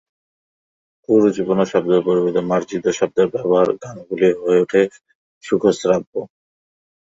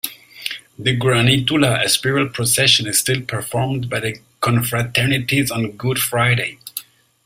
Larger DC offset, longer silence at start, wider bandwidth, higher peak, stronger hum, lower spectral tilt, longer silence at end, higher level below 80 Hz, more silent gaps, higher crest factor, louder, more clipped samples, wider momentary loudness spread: neither; first, 1.1 s vs 0.05 s; second, 8 kHz vs 16 kHz; about the same, -2 dBFS vs 0 dBFS; neither; first, -6 dB/octave vs -3.5 dB/octave; first, 0.75 s vs 0.45 s; second, -58 dBFS vs -50 dBFS; first, 5.15-5.41 s, 6.07-6.13 s vs none; about the same, 16 dB vs 18 dB; about the same, -18 LUFS vs -17 LUFS; neither; second, 7 LU vs 14 LU